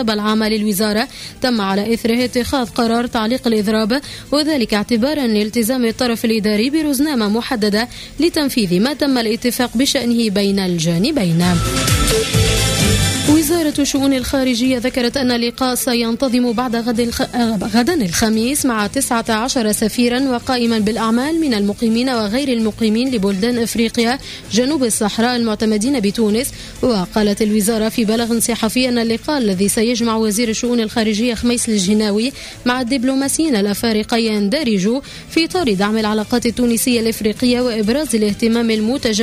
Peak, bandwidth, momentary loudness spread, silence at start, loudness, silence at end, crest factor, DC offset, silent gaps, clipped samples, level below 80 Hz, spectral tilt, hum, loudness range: -4 dBFS; 16 kHz; 3 LU; 0 s; -16 LUFS; 0 s; 12 dB; under 0.1%; none; under 0.1%; -36 dBFS; -4.5 dB/octave; none; 2 LU